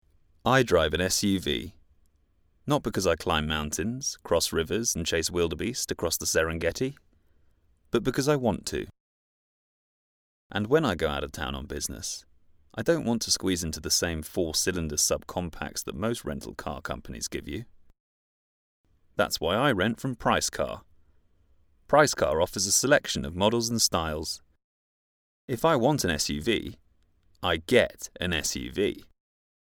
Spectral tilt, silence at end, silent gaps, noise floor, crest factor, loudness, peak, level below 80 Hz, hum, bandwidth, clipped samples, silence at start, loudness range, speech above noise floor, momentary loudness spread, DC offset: -3.5 dB/octave; 0.75 s; 9.00-10.50 s, 18.00-18.84 s, 24.64-25.48 s; -66 dBFS; 22 dB; -27 LUFS; -6 dBFS; -48 dBFS; none; 20 kHz; under 0.1%; 0.45 s; 6 LU; 39 dB; 12 LU; under 0.1%